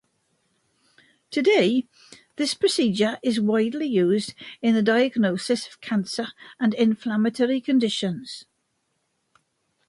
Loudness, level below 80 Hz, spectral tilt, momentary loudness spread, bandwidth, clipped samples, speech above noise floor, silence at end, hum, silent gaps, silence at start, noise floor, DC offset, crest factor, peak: -23 LUFS; -70 dBFS; -5 dB/octave; 11 LU; 11.5 kHz; under 0.1%; 51 dB; 1.45 s; none; none; 1.3 s; -73 dBFS; under 0.1%; 16 dB; -8 dBFS